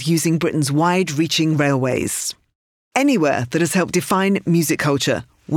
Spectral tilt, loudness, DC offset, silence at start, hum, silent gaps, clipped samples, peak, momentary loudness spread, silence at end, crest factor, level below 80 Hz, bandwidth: -5 dB/octave; -18 LUFS; under 0.1%; 0 s; none; 2.55-2.91 s; under 0.1%; -4 dBFS; 5 LU; 0 s; 14 dB; -56 dBFS; 18.5 kHz